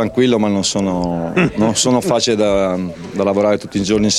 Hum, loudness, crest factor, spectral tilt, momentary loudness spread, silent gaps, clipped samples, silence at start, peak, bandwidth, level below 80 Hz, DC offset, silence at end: none; -16 LUFS; 16 dB; -4.5 dB/octave; 5 LU; none; under 0.1%; 0 s; 0 dBFS; 13.5 kHz; -42 dBFS; under 0.1%; 0 s